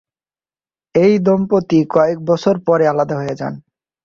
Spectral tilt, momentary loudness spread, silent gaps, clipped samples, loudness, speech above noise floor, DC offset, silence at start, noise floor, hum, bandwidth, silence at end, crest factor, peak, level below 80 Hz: -8 dB/octave; 11 LU; none; under 0.1%; -15 LUFS; over 76 dB; under 0.1%; 0.95 s; under -90 dBFS; none; 7.4 kHz; 0.45 s; 14 dB; -2 dBFS; -56 dBFS